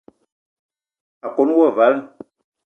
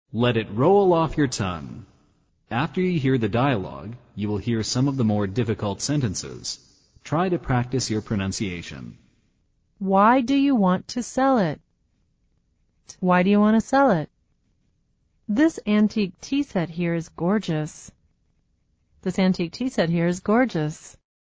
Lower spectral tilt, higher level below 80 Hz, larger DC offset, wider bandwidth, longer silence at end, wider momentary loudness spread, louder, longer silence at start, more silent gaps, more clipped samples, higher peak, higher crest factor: first, -7.5 dB/octave vs -6 dB/octave; second, -76 dBFS vs -50 dBFS; neither; second, 3.8 kHz vs 8 kHz; first, 0.6 s vs 0.35 s; about the same, 12 LU vs 14 LU; first, -17 LUFS vs -23 LUFS; first, 1.25 s vs 0.15 s; neither; neither; first, -2 dBFS vs -6 dBFS; about the same, 18 dB vs 16 dB